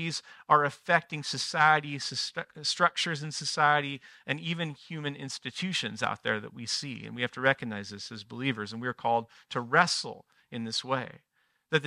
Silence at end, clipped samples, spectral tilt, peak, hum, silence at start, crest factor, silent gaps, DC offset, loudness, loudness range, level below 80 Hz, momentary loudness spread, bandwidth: 0 s; under 0.1%; -3.5 dB/octave; -8 dBFS; none; 0 s; 24 dB; none; under 0.1%; -29 LUFS; 5 LU; -76 dBFS; 13 LU; 14 kHz